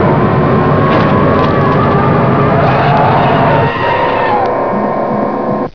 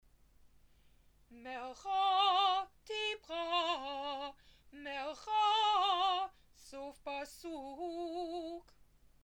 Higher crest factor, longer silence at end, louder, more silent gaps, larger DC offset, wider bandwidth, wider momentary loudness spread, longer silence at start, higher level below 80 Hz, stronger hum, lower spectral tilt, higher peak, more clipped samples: second, 10 dB vs 18 dB; second, 0.05 s vs 0.65 s; first, -10 LUFS vs -35 LUFS; neither; first, 2% vs under 0.1%; second, 5.4 kHz vs 17.5 kHz; second, 5 LU vs 17 LU; second, 0 s vs 1.3 s; first, -34 dBFS vs -68 dBFS; neither; first, -9 dB/octave vs -1.5 dB/octave; first, 0 dBFS vs -20 dBFS; first, 0.1% vs under 0.1%